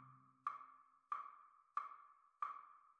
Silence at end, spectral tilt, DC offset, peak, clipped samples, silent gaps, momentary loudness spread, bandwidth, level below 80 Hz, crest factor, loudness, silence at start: 0.05 s; -4 dB/octave; under 0.1%; -28 dBFS; under 0.1%; none; 17 LU; 9 kHz; under -90 dBFS; 24 dB; -51 LUFS; 0 s